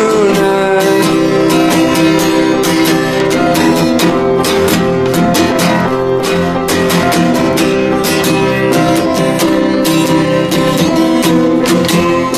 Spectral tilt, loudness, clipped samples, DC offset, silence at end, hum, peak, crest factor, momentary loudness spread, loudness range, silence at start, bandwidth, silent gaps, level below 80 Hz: -5 dB/octave; -11 LUFS; under 0.1%; under 0.1%; 0 s; none; 0 dBFS; 10 dB; 2 LU; 1 LU; 0 s; 15.5 kHz; none; -36 dBFS